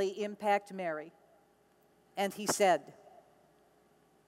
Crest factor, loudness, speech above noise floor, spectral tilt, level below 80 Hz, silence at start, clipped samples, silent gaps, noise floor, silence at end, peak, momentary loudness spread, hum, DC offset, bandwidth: 20 dB; -33 LUFS; 35 dB; -3 dB/octave; -84 dBFS; 0 s; under 0.1%; none; -68 dBFS; 1.35 s; -16 dBFS; 17 LU; none; under 0.1%; 16 kHz